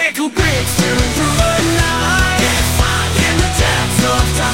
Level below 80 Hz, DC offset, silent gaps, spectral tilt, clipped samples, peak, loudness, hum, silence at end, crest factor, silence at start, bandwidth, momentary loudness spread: -22 dBFS; 2%; none; -3.5 dB/octave; under 0.1%; 0 dBFS; -13 LUFS; none; 0 s; 14 dB; 0 s; 16.5 kHz; 2 LU